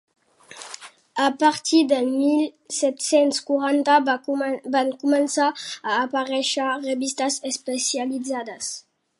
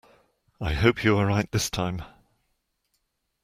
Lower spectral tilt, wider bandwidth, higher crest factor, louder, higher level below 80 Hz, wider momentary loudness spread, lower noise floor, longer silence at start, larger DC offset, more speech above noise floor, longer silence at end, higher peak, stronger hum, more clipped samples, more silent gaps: second, -1.5 dB/octave vs -5 dB/octave; second, 11.5 kHz vs 16 kHz; about the same, 18 dB vs 22 dB; first, -22 LUFS vs -25 LUFS; second, -78 dBFS vs -42 dBFS; about the same, 12 LU vs 11 LU; second, -44 dBFS vs -75 dBFS; about the same, 0.5 s vs 0.6 s; neither; second, 22 dB vs 51 dB; second, 0.4 s vs 1.35 s; about the same, -4 dBFS vs -6 dBFS; neither; neither; neither